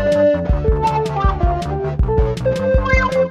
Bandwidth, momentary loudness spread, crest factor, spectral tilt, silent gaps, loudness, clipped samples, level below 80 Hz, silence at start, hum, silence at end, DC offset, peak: 10.5 kHz; 4 LU; 14 dB; -7.5 dB/octave; none; -17 LUFS; under 0.1%; -20 dBFS; 0 s; none; 0 s; under 0.1%; -2 dBFS